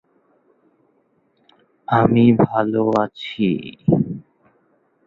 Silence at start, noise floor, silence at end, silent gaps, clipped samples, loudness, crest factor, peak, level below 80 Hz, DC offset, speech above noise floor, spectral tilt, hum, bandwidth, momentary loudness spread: 1.9 s; -63 dBFS; 0.85 s; none; under 0.1%; -18 LUFS; 18 dB; -2 dBFS; -52 dBFS; under 0.1%; 46 dB; -9 dB/octave; none; 5.2 kHz; 12 LU